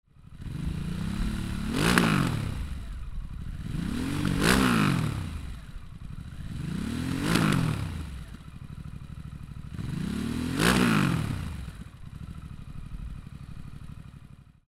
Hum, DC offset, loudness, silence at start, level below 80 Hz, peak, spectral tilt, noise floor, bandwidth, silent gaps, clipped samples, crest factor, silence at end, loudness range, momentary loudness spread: none; under 0.1%; -28 LUFS; 0.15 s; -40 dBFS; 0 dBFS; -5 dB/octave; -50 dBFS; 16 kHz; none; under 0.1%; 28 dB; 0.25 s; 4 LU; 21 LU